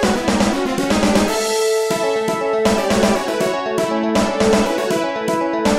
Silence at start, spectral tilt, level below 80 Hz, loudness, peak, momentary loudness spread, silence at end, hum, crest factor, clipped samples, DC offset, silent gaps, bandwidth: 0 s; -4.5 dB/octave; -40 dBFS; -17 LUFS; -4 dBFS; 4 LU; 0 s; none; 14 dB; under 0.1%; under 0.1%; none; 16 kHz